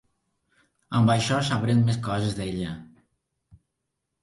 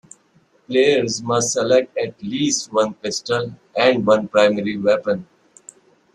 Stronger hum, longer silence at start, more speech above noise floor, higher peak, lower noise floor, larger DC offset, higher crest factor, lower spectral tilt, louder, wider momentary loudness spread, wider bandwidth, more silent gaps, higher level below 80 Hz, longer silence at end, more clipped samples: neither; first, 0.9 s vs 0.7 s; first, 57 dB vs 40 dB; second, -10 dBFS vs -2 dBFS; first, -81 dBFS vs -58 dBFS; neither; about the same, 18 dB vs 18 dB; first, -6 dB/octave vs -3.5 dB/octave; second, -25 LUFS vs -19 LUFS; about the same, 11 LU vs 9 LU; about the same, 11.5 kHz vs 11.5 kHz; neither; first, -52 dBFS vs -60 dBFS; first, 1.4 s vs 0.9 s; neither